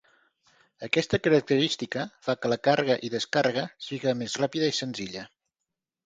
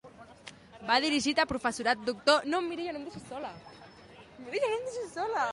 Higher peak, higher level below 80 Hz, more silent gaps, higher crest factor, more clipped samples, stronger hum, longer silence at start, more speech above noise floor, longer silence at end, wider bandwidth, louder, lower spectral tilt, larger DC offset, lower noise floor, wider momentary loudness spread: about the same, -8 dBFS vs -10 dBFS; about the same, -66 dBFS vs -62 dBFS; neither; about the same, 20 dB vs 22 dB; neither; neither; first, 0.8 s vs 0.05 s; first, 60 dB vs 22 dB; first, 0.8 s vs 0 s; second, 9.4 kHz vs 11.5 kHz; first, -27 LUFS vs -30 LUFS; first, -4.5 dB/octave vs -3 dB/octave; neither; first, -86 dBFS vs -53 dBFS; second, 12 LU vs 23 LU